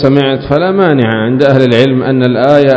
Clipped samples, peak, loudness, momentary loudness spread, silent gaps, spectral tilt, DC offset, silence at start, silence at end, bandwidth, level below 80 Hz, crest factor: 2%; 0 dBFS; -9 LUFS; 4 LU; none; -8 dB/octave; under 0.1%; 0 s; 0 s; 8 kHz; -40 dBFS; 8 dB